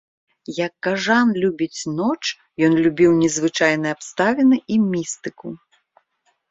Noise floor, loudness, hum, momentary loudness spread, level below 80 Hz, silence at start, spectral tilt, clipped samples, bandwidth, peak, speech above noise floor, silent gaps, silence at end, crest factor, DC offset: -67 dBFS; -19 LUFS; none; 15 LU; -58 dBFS; 0.5 s; -4.5 dB/octave; under 0.1%; 8 kHz; -2 dBFS; 49 dB; none; 0.95 s; 18 dB; under 0.1%